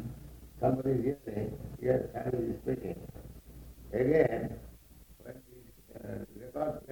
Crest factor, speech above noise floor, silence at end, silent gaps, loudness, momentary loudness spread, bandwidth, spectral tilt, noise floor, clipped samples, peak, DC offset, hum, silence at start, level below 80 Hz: 22 dB; 24 dB; 0 s; none; -33 LUFS; 23 LU; 19.5 kHz; -8.5 dB/octave; -56 dBFS; under 0.1%; -12 dBFS; under 0.1%; none; 0 s; -52 dBFS